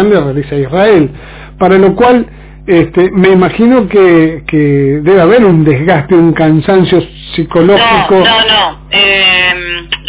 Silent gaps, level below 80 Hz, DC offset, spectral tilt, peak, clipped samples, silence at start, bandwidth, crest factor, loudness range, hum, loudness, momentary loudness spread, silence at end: none; -32 dBFS; under 0.1%; -10 dB/octave; 0 dBFS; 3%; 0 s; 4 kHz; 8 dB; 2 LU; none; -7 LUFS; 8 LU; 0 s